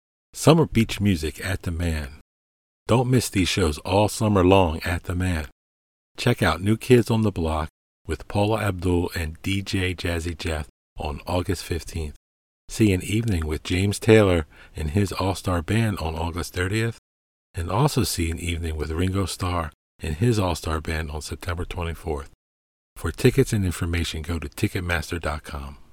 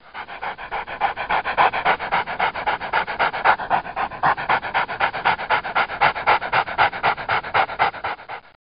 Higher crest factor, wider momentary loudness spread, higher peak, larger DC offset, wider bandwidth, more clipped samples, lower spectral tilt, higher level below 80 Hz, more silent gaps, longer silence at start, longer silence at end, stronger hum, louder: about the same, 22 dB vs 20 dB; first, 14 LU vs 11 LU; about the same, 0 dBFS vs -2 dBFS; second, under 0.1% vs 0.2%; first, 17 kHz vs 5.2 kHz; neither; first, -5.5 dB/octave vs 0 dB/octave; first, -36 dBFS vs -50 dBFS; first, 2.21-2.86 s, 5.52-6.15 s, 7.70-8.05 s, 10.69-10.96 s, 12.16-12.68 s, 16.98-17.54 s, 19.74-19.99 s, 22.35-22.96 s vs none; first, 0.35 s vs 0.05 s; about the same, 0.1 s vs 0.2 s; neither; second, -24 LUFS vs -21 LUFS